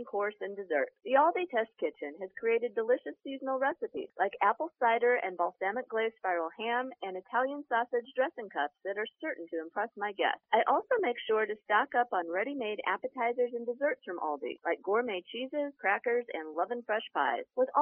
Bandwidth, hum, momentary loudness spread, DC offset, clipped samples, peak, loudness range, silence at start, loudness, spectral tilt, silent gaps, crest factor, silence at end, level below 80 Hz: 3.5 kHz; none; 9 LU; under 0.1%; under 0.1%; -12 dBFS; 3 LU; 0 s; -32 LUFS; -0.5 dB/octave; none; 20 dB; 0 s; -86 dBFS